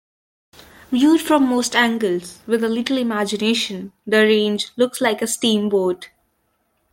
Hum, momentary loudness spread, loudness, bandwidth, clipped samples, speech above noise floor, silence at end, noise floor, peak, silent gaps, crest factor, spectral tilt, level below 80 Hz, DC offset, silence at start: none; 8 LU; -18 LUFS; 16.5 kHz; under 0.1%; 49 dB; 0.85 s; -67 dBFS; -2 dBFS; none; 18 dB; -3.5 dB/octave; -62 dBFS; under 0.1%; 0.9 s